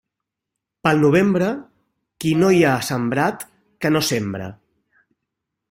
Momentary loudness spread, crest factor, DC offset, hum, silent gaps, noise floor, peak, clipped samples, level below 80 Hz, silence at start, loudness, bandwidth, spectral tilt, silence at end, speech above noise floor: 16 LU; 18 dB; under 0.1%; none; none; -82 dBFS; -2 dBFS; under 0.1%; -56 dBFS; 0.85 s; -19 LUFS; 16.5 kHz; -5.5 dB/octave; 1.15 s; 65 dB